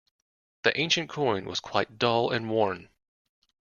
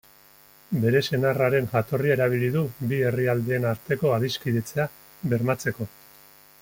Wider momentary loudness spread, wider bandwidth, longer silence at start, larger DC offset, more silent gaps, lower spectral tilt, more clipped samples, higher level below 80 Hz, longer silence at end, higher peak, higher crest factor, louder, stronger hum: second, 5 LU vs 8 LU; second, 7.2 kHz vs 17 kHz; about the same, 0.65 s vs 0.7 s; neither; neither; second, -4 dB/octave vs -6.5 dB/octave; neither; second, -66 dBFS vs -58 dBFS; first, 0.9 s vs 0.75 s; about the same, -6 dBFS vs -8 dBFS; first, 24 dB vs 18 dB; about the same, -27 LUFS vs -25 LUFS; neither